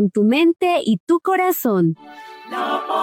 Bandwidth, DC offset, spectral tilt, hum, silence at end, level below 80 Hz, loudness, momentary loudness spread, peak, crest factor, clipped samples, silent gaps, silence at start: 17 kHz; under 0.1%; -6 dB/octave; none; 0 s; -70 dBFS; -18 LUFS; 15 LU; -8 dBFS; 10 dB; under 0.1%; 1.00-1.07 s; 0 s